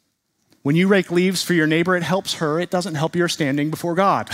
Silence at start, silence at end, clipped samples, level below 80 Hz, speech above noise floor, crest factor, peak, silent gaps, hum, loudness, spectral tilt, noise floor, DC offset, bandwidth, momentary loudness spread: 0.65 s; 0 s; under 0.1%; -62 dBFS; 50 dB; 16 dB; -4 dBFS; none; none; -19 LUFS; -5 dB/octave; -69 dBFS; under 0.1%; 16 kHz; 6 LU